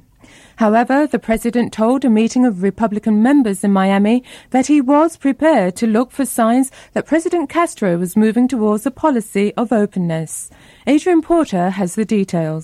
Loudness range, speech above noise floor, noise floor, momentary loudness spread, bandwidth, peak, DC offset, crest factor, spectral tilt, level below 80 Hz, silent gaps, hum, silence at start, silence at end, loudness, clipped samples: 3 LU; 30 dB; -45 dBFS; 6 LU; 14.5 kHz; -4 dBFS; under 0.1%; 12 dB; -6 dB/octave; -48 dBFS; none; none; 0.6 s; 0 s; -16 LUFS; under 0.1%